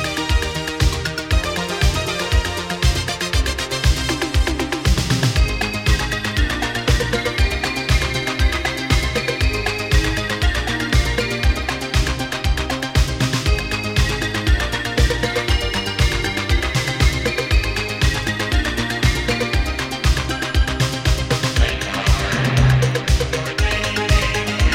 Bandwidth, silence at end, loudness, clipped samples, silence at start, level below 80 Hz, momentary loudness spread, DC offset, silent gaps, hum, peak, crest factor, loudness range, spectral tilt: 16.5 kHz; 0 s; -19 LUFS; under 0.1%; 0 s; -22 dBFS; 3 LU; under 0.1%; none; none; -2 dBFS; 16 dB; 2 LU; -4.5 dB/octave